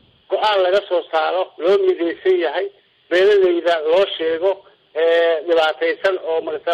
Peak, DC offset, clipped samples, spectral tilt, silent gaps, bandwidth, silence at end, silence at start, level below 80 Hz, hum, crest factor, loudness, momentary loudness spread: -8 dBFS; under 0.1%; under 0.1%; -4 dB/octave; none; 8.4 kHz; 0 s; 0.3 s; -64 dBFS; none; 10 dB; -18 LUFS; 7 LU